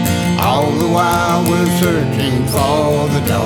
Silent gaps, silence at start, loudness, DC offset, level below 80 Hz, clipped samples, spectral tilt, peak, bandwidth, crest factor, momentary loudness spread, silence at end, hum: none; 0 s; -14 LUFS; under 0.1%; -36 dBFS; under 0.1%; -5.5 dB/octave; 0 dBFS; 18.5 kHz; 14 dB; 2 LU; 0 s; none